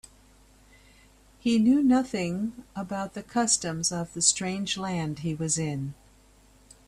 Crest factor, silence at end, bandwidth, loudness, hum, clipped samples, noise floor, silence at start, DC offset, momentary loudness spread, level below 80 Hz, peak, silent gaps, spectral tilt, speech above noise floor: 22 dB; 0.95 s; 13 kHz; -26 LUFS; none; under 0.1%; -57 dBFS; 1.45 s; under 0.1%; 12 LU; -58 dBFS; -6 dBFS; none; -3.5 dB/octave; 31 dB